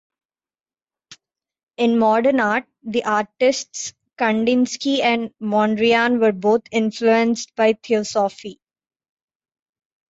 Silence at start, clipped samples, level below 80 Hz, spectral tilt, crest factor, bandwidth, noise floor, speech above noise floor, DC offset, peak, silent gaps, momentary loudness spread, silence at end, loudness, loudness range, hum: 1.1 s; under 0.1%; -66 dBFS; -4 dB/octave; 16 dB; 8 kHz; under -90 dBFS; over 71 dB; under 0.1%; -4 dBFS; 1.63-1.67 s; 8 LU; 1.6 s; -19 LUFS; 3 LU; none